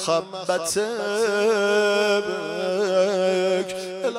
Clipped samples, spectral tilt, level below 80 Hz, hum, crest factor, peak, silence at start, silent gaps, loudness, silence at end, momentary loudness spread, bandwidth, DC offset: under 0.1%; -3.5 dB/octave; -68 dBFS; none; 14 dB; -10 dBFS; 0 s; none; -22 LUFS; 0 s; 7 LU; 16 kHz; under 0.1%